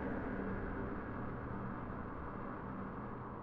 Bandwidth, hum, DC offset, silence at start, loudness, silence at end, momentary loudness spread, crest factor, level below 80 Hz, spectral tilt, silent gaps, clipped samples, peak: 5.2 kHz; none; under 0.1%; 0 s; -44 LUFS; 0 s; 4 LU; 14 dB; -52 dBFS; -8 dB/octave; none; under 0.1%; -30 dBFS